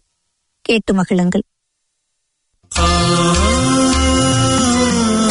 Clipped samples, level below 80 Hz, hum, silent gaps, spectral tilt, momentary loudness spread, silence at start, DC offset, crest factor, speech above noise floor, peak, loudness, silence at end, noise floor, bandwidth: under 0.1%; -28 dBFS; none; none; -4.5 dB/octave; 6 LU; 0.7 s; under 0.1%; 14 dB; 56 dB; 0 dBFS; -14 LUFS; 0 s; -71 dBFS; 11 kHz